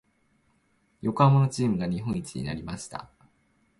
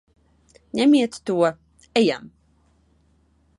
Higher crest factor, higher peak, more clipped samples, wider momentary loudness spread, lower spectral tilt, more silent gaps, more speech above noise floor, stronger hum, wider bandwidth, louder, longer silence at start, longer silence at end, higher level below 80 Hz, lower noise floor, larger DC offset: about the same, 20 dB vs 18 dB; about the same, -8 dBFS vs -6 dBFS; neither; first, 17 LU vs 10 LU; first, -7 dB/octave vs -5 dB/octave; neither; about the same, 43 dB vs 42 dB; neither; about the same, 11.5 kHz vs 11.5 kHz; second, -26 LUFS vs -21 LUFS; first, 1.05 s vs 0.75 s; second, 0.75 s vs 1.35 s; first, -54 dBFS vs -62 dBFS; first, -68 dBFS vs -61 dBFS; neither